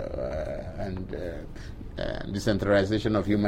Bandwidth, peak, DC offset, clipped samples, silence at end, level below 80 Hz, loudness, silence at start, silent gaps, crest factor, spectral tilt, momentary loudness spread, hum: 15.5 kHz; -12 dBFS; under 0.1%; under 0.1%; 0 s; -40 dBFS; -29 LUFS; 0 s; none; 18 dB; -6.5 dB/octave; 17 LU; none